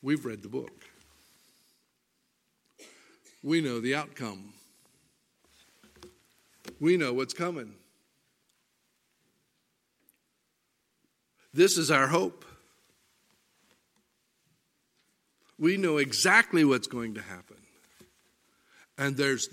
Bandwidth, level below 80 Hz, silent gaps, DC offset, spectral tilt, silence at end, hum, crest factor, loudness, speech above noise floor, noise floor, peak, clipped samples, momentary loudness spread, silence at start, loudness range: 16 kHz; -76 dBFS; none; under 0.1%; -4 dB/octave; 0.05 s; none; 26 dB; -27 LUFS; 49 dB; -77 dBFS; -6 dBFS; under 0.1%; 23 LU; 0.05 s; 12 LU